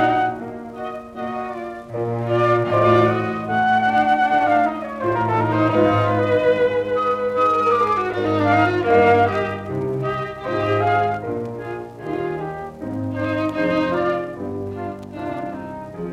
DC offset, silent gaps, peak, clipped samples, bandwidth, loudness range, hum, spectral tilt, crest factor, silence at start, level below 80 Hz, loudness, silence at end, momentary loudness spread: under 0.1%; none; -4 dBFS; under 0.1%; 11.5 kHz; 6 LU; none; -7.5 dB/octave; 16 dB; 0 s; -52 dBFS; -20 LUFS; 0 s; 14 LU